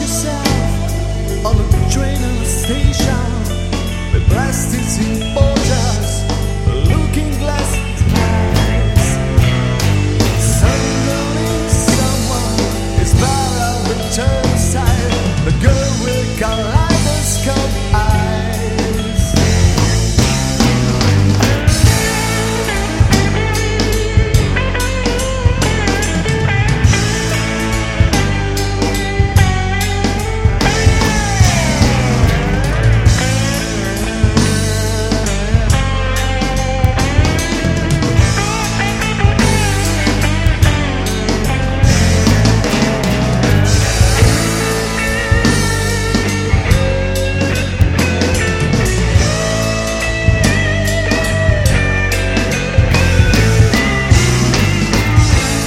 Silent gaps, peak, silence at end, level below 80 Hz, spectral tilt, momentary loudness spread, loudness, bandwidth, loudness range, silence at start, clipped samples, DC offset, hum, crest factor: none; 0 dBFS; 0 s; -20 dBFS; -5 dB/octave; 5 LU; -14 LUFS; 16 kHz; 3 LU; 0 s; under 0.1%; under 0.1%; none; 12 dB